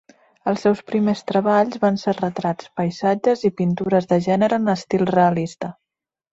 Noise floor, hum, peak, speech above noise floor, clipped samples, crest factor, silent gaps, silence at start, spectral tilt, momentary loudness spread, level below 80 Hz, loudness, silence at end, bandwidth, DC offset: -85 dBFS; none; -4 dBFS; 66 dB; under 0.1%; 16 dB; none; 0.45 s; -7 dB/octave; 8 LU; -60 dBFS; -20 LUFS; 0.6 s; 7.8 kHz; under 0.1%